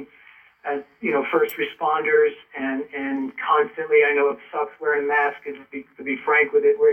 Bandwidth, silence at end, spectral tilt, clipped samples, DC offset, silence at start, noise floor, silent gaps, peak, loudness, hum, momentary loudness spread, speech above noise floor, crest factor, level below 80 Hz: 17.5 kHz; 0 s; -5 dB/octave; under 0.1%; under 0.1%; 0 s; -51 dBFS; none; -6 dBFS; -22 LUFS; none; 12 LU; 30 dB; 16 dB; -72 dBFS